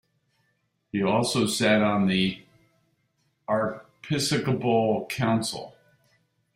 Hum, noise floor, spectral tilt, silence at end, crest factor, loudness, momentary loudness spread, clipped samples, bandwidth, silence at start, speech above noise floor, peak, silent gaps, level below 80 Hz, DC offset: none; -73 dBFS; -5 dB/octave; 0.85 s; 18 dB; -25 LUFS; 15 LU; under 0.1%; 16 kHz; 0.95 s; 49 dB; -8 dBFS; none; -62 dBFS; under 0.1%